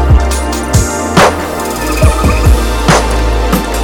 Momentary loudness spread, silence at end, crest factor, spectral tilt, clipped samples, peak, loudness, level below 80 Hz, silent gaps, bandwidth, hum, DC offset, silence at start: 6 LU; 0 s; 10 dB; -5 dB/octave; 0.2%; 0 dBFS; -11 LUFS; -14 dBFS; none; 19 kHz; none; under 0.1%; 0 s